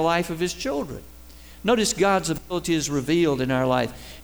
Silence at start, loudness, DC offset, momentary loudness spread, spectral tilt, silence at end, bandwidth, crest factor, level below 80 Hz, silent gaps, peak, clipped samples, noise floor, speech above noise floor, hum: 0 s; -23 LUFS; 0.3%; 9 LU; -4.5 dB/octave; 0 s; over 20 kHz; 16 dB; -46 dBFS; none; -8 dBFS; under 0.1%; -45 dBFS; 22 dB; none